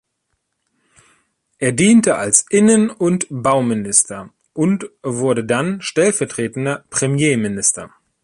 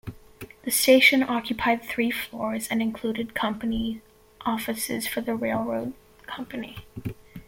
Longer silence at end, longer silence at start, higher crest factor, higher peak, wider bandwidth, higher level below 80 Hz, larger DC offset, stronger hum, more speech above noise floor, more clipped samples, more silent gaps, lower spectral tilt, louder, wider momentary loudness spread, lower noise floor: first, 0.35 s vs 0.05 s; first, 1.6 s vs 0.05 s; about the same, 18 dB vs 22 dB; first, 0 dBFS vs -4 dBFS; second, 11.5 kHz vs 17 kHz; about the same, -56 dBFS vs -52 dBFS; neither; neither; first, 55 dB vs 20 dB; neither; neither; first, -4.5 dB/octave vs -3 dB/octave; first, -16 LUFS vs -25 LUFS; second, 10 LU vs 20 LU; first, -72 dBFS vs -45 dBFS